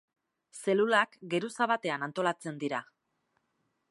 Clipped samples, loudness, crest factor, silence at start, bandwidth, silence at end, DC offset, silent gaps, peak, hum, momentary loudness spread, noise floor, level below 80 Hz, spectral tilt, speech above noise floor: under 0.1%; -31 LUFS; 22 dB; 0.55 s; 11.5 kHz; 1.05 s; under 0.1%; none; -10 dBFS; none; 11 LU; -78 dBFS; -86 dBFS; -4.5 dB/octave; 48 dB